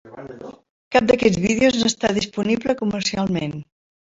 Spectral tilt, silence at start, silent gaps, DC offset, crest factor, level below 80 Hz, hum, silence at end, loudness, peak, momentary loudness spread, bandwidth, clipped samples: -4.5 dB/octave; 0.05 s; 0.70-0.91 s; under 0.1%; 20 dB; -50 dBFS; none; 0.5 s; -20 LUFS; -2 dBFS; 20 LU; 8 kHz; under 0.1%